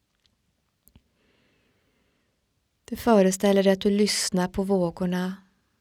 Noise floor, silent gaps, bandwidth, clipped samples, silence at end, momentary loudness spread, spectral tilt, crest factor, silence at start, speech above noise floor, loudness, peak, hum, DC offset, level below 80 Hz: -73 dBFS; none; 16.5 kHz; under 0.1%; 0.45 s; 11 LU; -5 dB/octave; 20 dB; 2.9 s; 51 dB; -23 LUFS; -6 dBFS; none; under 0.1%; -54 dBFS